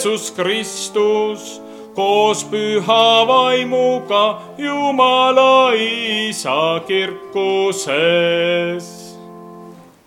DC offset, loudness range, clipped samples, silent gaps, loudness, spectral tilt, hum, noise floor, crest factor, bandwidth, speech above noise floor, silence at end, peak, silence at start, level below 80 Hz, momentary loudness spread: under 0.1%; 4 LU; under 0.1%; none; -15 LUFS; -3 dB/octave; none; -39 dBFS; 16 dB; 15.5 kHz; 23 dB; 0.25 s; 0 dBFS; 0 s; -68 dBFS; 12 LU